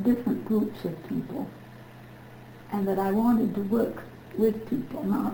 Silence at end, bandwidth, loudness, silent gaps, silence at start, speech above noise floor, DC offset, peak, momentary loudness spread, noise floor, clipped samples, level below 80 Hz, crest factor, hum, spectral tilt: 0 s; over 20 kHz; -28 LUFS; none; 0 s; 20 dB; under 0.1%; -12 dBFS; 23 LU; -46 dBFS; under 0.1%; -58 dBFS; 16 dB; none; -8.5 dB/octave